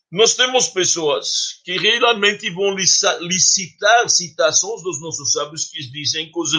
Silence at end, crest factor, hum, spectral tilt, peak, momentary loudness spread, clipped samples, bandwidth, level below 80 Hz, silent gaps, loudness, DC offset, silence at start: 0 s; 18 dB; none; -1 dB/octave; 0 dBFS; 9 LU; under 0.1%; 11 kHz; -68 dBFS; none; -16 LUFS; under 0.1%; 0.1 s